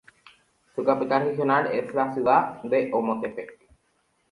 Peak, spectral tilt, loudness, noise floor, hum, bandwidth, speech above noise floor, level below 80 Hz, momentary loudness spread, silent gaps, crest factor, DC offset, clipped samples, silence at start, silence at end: -6 dBFS; -7.5 dB/octave; -24 LUFS; -69 dBFS; none; 11.5 kHz; 45 dB; -68 dBFS; 12 LU; none; 20 dB; under 0.1%; under 0.1%; 0.75 s; 0.75 s